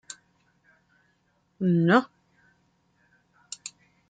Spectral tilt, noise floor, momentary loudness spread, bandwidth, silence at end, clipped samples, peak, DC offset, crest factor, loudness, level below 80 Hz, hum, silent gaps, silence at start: -6 dB/octave; -70 dBFS; 24 LU; 9.2 kHz; 0.4 s; under 0.1%; -8 dBFS; under 0.1%; 22 dB; -23 LUFS; -74 dBFS; none; none; 1.6 s